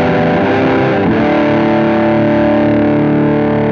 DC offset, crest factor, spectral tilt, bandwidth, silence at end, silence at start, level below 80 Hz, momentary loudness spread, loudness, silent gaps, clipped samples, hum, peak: under 0.1%; 10 dB; -8.5 dB/octave; 6.6 kHz; 0 s; 0 s; -38 dBFS; 1 LU; -11 LUFS; none; under 0.1%; none; -2 dBFS